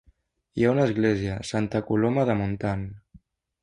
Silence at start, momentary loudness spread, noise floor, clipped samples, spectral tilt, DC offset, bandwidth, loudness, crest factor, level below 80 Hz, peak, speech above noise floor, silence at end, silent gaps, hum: 0.55 s; 9 LU; -63 dBFS; under 0.1%; -7 dB/octave; under 0.1%; 11 kHz; -25 LUFS; 18 dB; -50 dBFS; -8 dBFS; 39 dB; 0.45 s; none; none